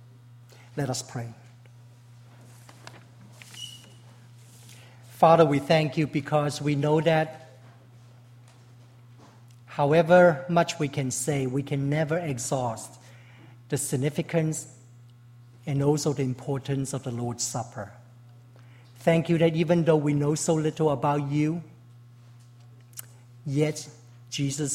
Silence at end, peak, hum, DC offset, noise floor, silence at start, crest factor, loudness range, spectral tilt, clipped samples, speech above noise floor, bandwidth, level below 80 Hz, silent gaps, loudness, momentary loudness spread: 0 s; -6 dBFS; none; under 0.1%; -51 dBFS; 0.75 s; 22 dB; 14 LU; -5.5 dB/octave; under 0.1%; 27 dB; 16 kHz; -64 dBFS; none; -25 LUFS; 20 LU